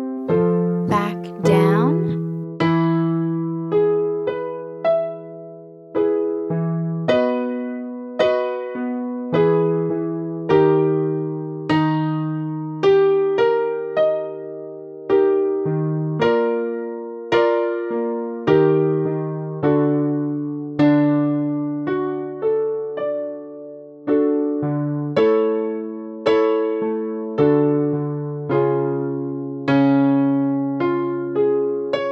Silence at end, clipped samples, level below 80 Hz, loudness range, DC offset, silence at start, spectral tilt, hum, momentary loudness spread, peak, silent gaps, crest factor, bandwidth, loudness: 0 s; under 0.1%; -60 dBFS; 3 LU; under 0.1%; 0 s; -8.5 dB/octave; none; 11 LU; -4 dBFS; none; 16 dB; 11.5 kHz; -20 LUFS